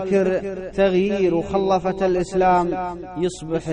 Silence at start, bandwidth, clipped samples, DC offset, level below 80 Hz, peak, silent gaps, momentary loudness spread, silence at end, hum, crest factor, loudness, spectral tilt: 0 s; 10 kHz; under 0.1%; under 0.1%; -44 dBFS; -6 dBFS; none; 9 LU; 0 s; none; 14 dB; -21 LUFS; -6.5 dB/octave